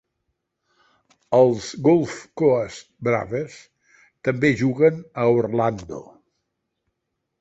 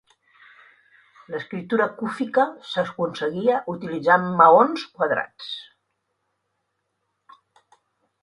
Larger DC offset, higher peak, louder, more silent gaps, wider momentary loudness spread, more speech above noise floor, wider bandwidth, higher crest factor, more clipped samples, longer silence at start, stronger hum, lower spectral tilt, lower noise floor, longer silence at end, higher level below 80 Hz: neither; second, -4 dBFS vs 0 dBFS; about the same, -21 LUFS vs -21 LUFS; neither; second, 13 LU vs 18 LU; first, 58 dB vs 54 dB; second, 8 kHz vs 11 kHz; second, 18 dB vs 24 dB; neither; about the same, 1.3 s vs 1.3 s; neither; about the same, -7 dB/octave vs -6.5 dB/octave; about the same, -79 dBFS vs -76 dBFS; second, 1.4 s vs 2.6 s; first, -58 dBFS vs -68 dBFS